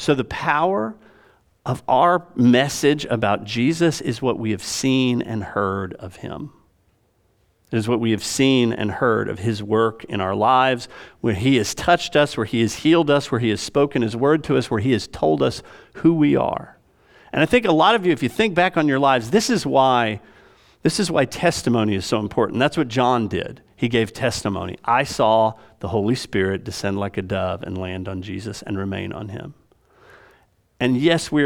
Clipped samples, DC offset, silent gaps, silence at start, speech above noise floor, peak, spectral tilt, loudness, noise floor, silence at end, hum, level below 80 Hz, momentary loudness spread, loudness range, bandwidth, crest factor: under 0.1%; under 0.1%; none; 0 s; 43 dB; -2 dBFS; -5 dB/octave; -20 LUFS; -63 dBFS; 0 s; none; -52 dBFS; 12 LU; 7 LU; 17.5 kHz; 18 dB